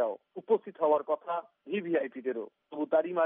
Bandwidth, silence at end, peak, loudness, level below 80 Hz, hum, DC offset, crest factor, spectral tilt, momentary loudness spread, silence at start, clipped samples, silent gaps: 3.8 kHz; 0 s; -14 dBFS; -32 LUFS; under -90 dBFS; none; under 0.1%; 16 dB; -4.5 dB/octave; 10 LU; 0 s; under 0.1%; none